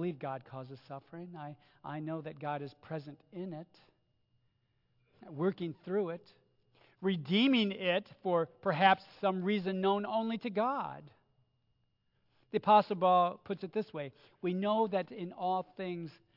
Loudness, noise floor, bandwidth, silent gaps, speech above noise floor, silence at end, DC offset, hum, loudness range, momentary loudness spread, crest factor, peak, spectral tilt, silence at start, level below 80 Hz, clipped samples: -33 LUFS; -77 dBFS; 5.8 kHz; none; 43 dB; 0.25 s; under 0.1%; none; 12 LU; 20 LU; 22 dB; -12 dBFS; -4 dB/octave; 0 s; -82 dBFS; under 0.1%